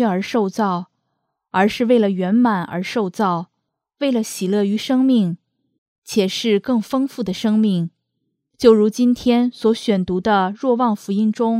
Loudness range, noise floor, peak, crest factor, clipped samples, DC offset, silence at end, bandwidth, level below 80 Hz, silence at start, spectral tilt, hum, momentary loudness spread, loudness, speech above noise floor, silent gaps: 3 LU; -76 dBFS; 0 dBFS; 18 dB; under 0.1%; under 0.1%; 0 s; 15 kHz; -56 dBFS; 0 s; -6 dB/octave; none; 8 LU; -18 LUFS; 59 dB; 5.78-6.02 s